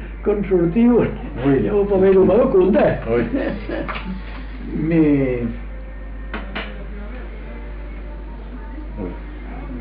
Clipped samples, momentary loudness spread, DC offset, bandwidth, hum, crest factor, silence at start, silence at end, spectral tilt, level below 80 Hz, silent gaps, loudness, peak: under 0.1%; 20 LU; under 0.1%; 5 kHz; none; 14 dB; 0 s; 0 s; -7.5 dB/octave; -30 dBFS; none; -18 LUFS; -6 dBFS